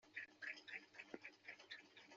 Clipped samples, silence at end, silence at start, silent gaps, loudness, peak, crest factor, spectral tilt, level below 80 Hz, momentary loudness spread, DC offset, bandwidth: under 0.1%; 0 s; 0 s; none; -55 LUFS; -36 dBFS; 22 dB; 0.5 dB/octave; under -90 dBFS; 7 LU; under 0.1%; 7.4 kHz